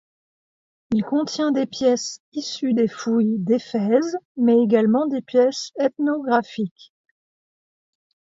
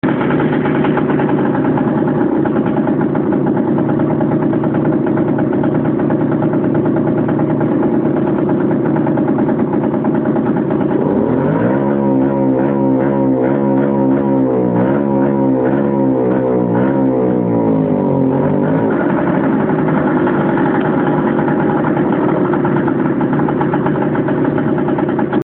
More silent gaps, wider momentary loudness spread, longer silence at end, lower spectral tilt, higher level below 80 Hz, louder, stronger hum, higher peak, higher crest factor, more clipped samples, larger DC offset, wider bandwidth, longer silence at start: first, 2.20-2.32 s, 4.25-4.35 s vs none; first, 10 LU vs 1 LU; first, 1.6 s vs 0 s; second, -5.5 dB/octave vs -12.5 dB/octave; second, -64 dBFS vs -44 dBFS; second, -21 LUFS vs -14 LUFS; neither; about the same, -4 dBFS vs -2 dBFS; first, 18 dB vs 12 dB; neither; neither; first, 7.8 kHz vs 4 kHz; first, 0.9 s vs 0.05 s